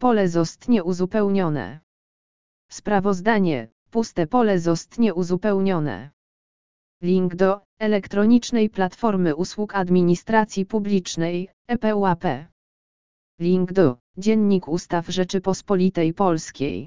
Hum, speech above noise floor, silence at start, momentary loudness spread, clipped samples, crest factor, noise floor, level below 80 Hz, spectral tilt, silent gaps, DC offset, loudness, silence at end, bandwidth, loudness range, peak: none; over 69 dB; 0 s; 8 LU; under 0.1%; 18 dB; under -90 dBFS; -52 dBFS; -6.5 dB/octave; 1.83-2.69 s, 3.72-3.86 s, 6.13-7.00 s, 7.65-7.77 s, 11.53-11.65 s, 12.52-13.38 s, 14.00-14.14 s; 1%; -22 LUFS; 0 s; 7.6 kHz; 3 LU; -4 dBFS